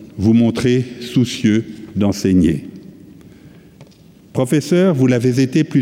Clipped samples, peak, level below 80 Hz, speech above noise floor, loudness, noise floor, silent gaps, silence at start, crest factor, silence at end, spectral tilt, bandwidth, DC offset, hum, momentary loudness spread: under 0.1%; -4 dBFS; -48 dBFS; 30 dB; -16 LUFS; -45 dBFS; none; 0 s; 12 dB; 0 s; -7 dB/octave; 16 kHz; under 0.1%; none; 8 LU